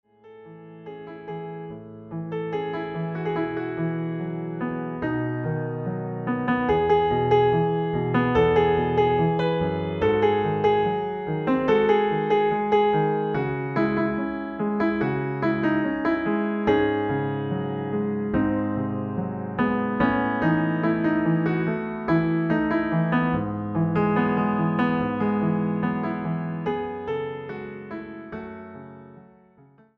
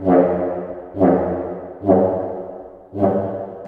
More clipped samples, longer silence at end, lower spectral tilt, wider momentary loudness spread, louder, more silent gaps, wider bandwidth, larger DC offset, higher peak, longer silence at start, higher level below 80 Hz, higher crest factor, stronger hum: neither; first, 0.8 s vs 0 s; second, -9.5 dB/octave vs -11.5 dB/octave; about the same, 14 LU vs 15 LU; second, -24 LUFS vs -19 LUFS; neither; first, 6 kHz vs 3.6 kHz; neither; second, -8 dBFS vs -2 dBFS; first, 0.25 s vs 0 s; about the same, -50 dBFS vs -50 dBFS; about the same, 16 dB vs 18 dB; neither